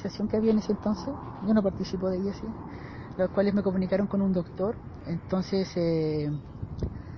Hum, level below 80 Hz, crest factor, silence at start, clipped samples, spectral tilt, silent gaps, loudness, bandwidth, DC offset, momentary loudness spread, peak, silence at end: none; -46 dBFS; 16 dB; 0 s; under 0.1%; -8 dB/octave; none; -29 LUFS; 6.6 kHz; under 0.1%; 12 LU; -12 dBFS; 0 s